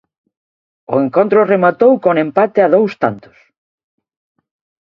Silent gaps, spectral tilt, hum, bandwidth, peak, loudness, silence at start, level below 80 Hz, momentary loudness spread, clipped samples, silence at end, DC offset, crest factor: none; -9 dB/octave; none; 6 kHz; 0 dBFS; -13 LUFS; 0.9 s; -60 dBFS; 9 LU; under 0.1%; 1.65 s; under 0.1%; 14 dB